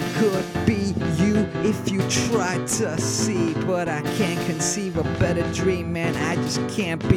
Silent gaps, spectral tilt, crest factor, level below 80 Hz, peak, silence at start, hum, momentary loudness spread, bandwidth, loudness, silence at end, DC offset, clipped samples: none; -5 dB/octave; 18 dB; -44 dBFS; -4 dBFS; 0 s; none; 3 LU; 17 kHz; -23 LUFS; 0 s; under 0.1%; under 0.1%